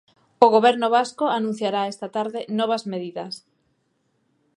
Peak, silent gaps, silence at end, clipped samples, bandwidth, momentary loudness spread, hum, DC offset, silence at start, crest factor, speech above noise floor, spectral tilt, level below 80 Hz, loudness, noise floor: 0 dBFS; none; 1.2 s; under 0.1%; 11 kHz; 15 LU; none; under 0.1%; 0.4 s; 22 dB; 48 dB; -5 dB/octave; -78 dBFS; -21 LUFS; -69 dBFS